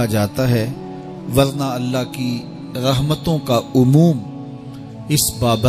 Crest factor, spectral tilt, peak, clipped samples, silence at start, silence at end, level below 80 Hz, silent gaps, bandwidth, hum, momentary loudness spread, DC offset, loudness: 16 dB; -5.5 dB/octave; -2 dBFS; under 0.1%; 0 s; 0 s; -42 dBFS; none; 16 kHz; none; 17 LU; under 0.1%; -18 LUFS